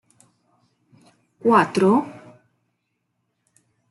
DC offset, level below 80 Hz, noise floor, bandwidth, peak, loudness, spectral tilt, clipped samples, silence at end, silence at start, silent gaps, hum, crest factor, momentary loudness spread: under 0.1%; -70 dBFS; -75 dBFS; 12 kHz; -4 dBFS; -19 LUFS; -6.5 dB/octave; under 0.1%; 1.8 s; 1.45 s; none; none; 22 dB; 9 LU